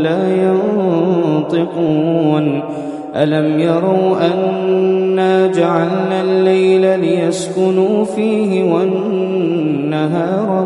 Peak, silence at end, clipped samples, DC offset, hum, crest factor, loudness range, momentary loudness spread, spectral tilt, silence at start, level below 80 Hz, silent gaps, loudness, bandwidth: 0 dBFS; 0 s; under 0.1%; under 0.1%; none; 14 dB; 2 LU; 4 LU; -7 dB/octave; 0 s; -60 dBFS; none; -14 LUFS; 11.5 kHz